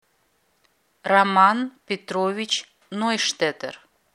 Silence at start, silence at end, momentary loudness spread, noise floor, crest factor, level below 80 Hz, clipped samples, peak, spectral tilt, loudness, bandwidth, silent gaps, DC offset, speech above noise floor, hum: 1.05 s; 0.45 s; 17 LU; -67 dBFS; 22 dB; -78 dBFS; under 0.1%; -2 dBFS; -3 dB/octave; -21 LUFS; 14 kHz; none; under 0.1%; 45 dB; none